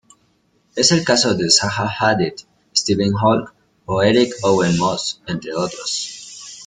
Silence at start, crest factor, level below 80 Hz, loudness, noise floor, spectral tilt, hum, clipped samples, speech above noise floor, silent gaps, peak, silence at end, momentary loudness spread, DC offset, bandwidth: 0.75 s; 18 dB; -52 dBFS; -17 LUFS; -61 dBFS; -3.5 dB/octave; none; under 0.1%; 44 dB; none; 0 dBFS; 0 s; 11 LU; under 0.1%; 9.6 kHz